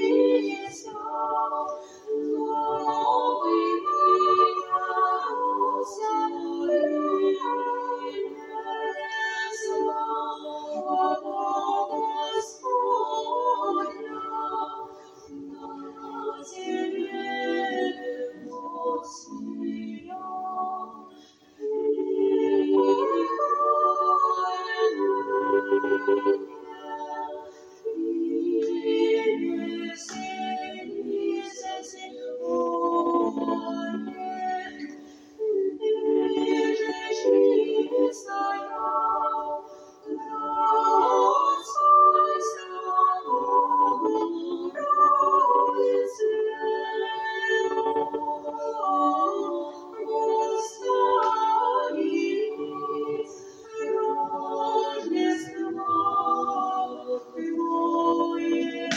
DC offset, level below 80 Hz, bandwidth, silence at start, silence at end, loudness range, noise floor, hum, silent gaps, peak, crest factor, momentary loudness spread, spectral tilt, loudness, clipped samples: under 0.1%; -76 dBFS; 10.5 kHz; 0 s; 0 s; 8 LU; -52 dBFS; none; none; -10 dBFS; 16 dB; 14 LU; -3.5 dB/octave; -25 LUFS; under 0.1%